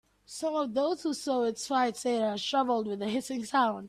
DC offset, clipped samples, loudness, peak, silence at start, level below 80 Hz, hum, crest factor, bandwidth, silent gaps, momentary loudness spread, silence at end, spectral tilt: under 0.1%; under 0.1%; -30 LUFS; -14 dBFS; 0.3 s; -72 dBFS; none; 16 dB; 14.5 kHz; none; 5 LU; 0 s; -3.5 dB/octave